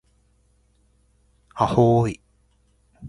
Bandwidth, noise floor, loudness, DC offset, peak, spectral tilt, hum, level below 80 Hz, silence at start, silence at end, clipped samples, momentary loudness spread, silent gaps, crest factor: 11 kHz; -62 dBFS; -20 LUFS; under 0.1%; -4 dBFS; -8 dB/octave; none; -50 dBFS; 1.55 s; 0 s; under 0.1%; 23 LU; none; 22 dB